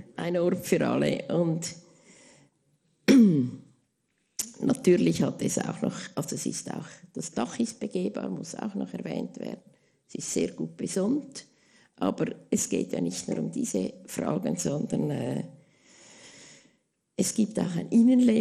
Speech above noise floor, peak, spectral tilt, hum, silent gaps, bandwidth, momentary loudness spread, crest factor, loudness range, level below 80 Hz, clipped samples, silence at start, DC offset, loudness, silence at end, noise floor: 47 dB; -6 dBFS; -5.5 dB/octave; none; none; 13.5 kHz; 17 LU; 22 dB; 8 LU; -66 dBFS; under 0.1%; 0 s; under 0.1%; -28 LUFS; 0 s; -75 dBFS